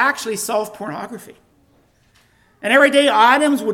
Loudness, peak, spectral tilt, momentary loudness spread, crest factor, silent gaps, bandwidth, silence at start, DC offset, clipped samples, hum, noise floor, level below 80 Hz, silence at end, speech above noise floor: -15 LUFS; 0 dBFS; -2.5 dB/octave; 18 LU; 18 dB; none; 17.5 kHz; 0 s; under 0.1%; under 0.1%; none; -57 dBFS; -64 dBFS; 0 s; 40 dB